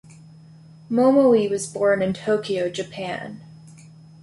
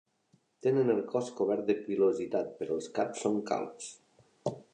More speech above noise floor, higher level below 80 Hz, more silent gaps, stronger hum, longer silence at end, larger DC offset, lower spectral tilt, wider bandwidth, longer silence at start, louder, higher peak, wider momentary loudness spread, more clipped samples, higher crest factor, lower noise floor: second, 26 dB vs 39 dB; first, -62 dBFS vs -76 dBFS; neither; neither; first, 0.5 s vs 0.1 s; neither; about the same, -5.5 dB/octave vs -6 dB/octave; first, 11.5 kHz vs 9.8 kHz; first, 0.9 s vs 0.65 s; first, -21 LUFS vs -32 LUFS; first, -6 dBFS vs -16 dBFS; first, 15 LU vs 11 LU; neither; about the same, 16 dB vs 16 dB; second, -46 dBFS vs -70 dBFS